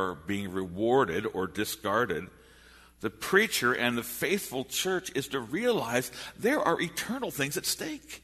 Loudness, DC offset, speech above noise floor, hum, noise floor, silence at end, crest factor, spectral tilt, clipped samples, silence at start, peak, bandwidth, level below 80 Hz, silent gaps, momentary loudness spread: -29 LUFS; under 0.1%; 26 dB; none; -56 dBFS; 0.05 s; 22 dB; -3.5 dB/octave; under 0.1%; 0 s; -8 dBFS; 13.5 kHz; -60 dBFS; none; 9 LU